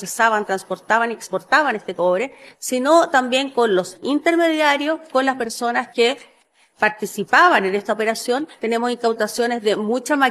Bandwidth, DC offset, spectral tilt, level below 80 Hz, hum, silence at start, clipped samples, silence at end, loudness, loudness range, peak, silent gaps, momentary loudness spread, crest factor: 14 kHz; under 0.1%; -3 dB/octave; -68 dBFS; none; 0 s; under 0.1%; 0 s; -19 LUFS; 1 LU; -2 dBFS; none; 8 LU; 18 dB